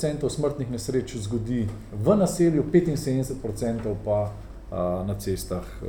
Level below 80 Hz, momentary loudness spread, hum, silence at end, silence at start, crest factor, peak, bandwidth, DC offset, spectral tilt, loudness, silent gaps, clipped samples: -42 dBFS; 9 LU; none; 0 s; 0 s; 18 dB; -8 dBFS; 19.5 kHz; under 0.1%; -7 dB/octave; -26 LUFS; none; under 0.1%